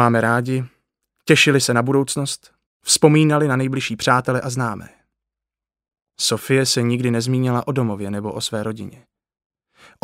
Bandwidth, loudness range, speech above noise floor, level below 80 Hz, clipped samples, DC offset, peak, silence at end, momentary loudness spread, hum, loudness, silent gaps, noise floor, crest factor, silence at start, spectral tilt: 16 kHz; 5 LU; 71 dB; -60 dBFS; under 0.1%; under 0.1%; 0 dBFS; 1.1 s; 14 LU; none; -18 LUFS; 2.66-2.80 s; -89 dBFS; 20 dB; 0 s; -4.5 dB/octave